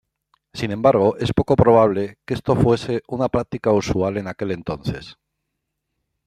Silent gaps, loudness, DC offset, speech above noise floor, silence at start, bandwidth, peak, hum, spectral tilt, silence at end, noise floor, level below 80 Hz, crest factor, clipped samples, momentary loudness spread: none; -20 LUFS; under 0.1%; 59 dB; 0.55 s; 13 kHz; -2 dBFS; none; -7.5 dB/octave; 1.15 s; -78 dBFS; -44 dBFS; 18 dB; under 0.1%; 12 LU